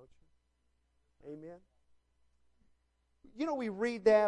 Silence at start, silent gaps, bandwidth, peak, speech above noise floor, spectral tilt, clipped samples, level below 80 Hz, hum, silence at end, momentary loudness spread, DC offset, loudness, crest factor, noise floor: 1.25 s; none; 10.5 kHz; -16 dBFS; 45 dB; -5.5 dB/octave; under 0.1%; -72 dBFS; none; 0 s; 22 LU; under 0.1%; -34 LUFS; 22 dB; -77 dBFS